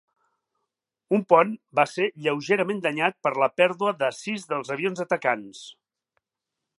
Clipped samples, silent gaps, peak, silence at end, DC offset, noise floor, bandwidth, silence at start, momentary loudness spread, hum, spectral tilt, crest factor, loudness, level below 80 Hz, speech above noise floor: under 0.1%; none; -4 dBFS; 1.05 s; under 0.1%; -86 dBFS; 11.5 kHz; 1.1 s; 10 LU; none; -5 dB/octave; 22 dB; -24 LUFS; -80 dBFS; 61 dB